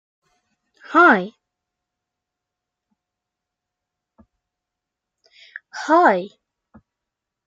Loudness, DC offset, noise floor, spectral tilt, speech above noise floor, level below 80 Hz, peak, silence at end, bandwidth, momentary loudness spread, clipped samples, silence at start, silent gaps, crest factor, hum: -16 LUFS; under 0.1%; -84 dBFS; -5.5 dB/octave; 68 dB; -76 dBFS; -2 dBFS; 1.2 s; 7.8 kHz; 25 LU; under 0.1%; 0.9 s; none; 22 dB; none